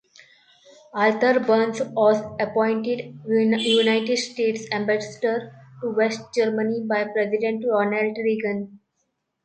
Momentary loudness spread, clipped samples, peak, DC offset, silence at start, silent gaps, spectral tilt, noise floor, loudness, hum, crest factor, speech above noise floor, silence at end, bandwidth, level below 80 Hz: 9 LU; under 0.1%; -6 dBFS; under 0.1%; 0.95 s; none; -4.5 dB/octave; -75 dBFS; -22 LUFS; none; 16 dB; 53 dB; 0.7 s; 9 kHz; -68 dBFS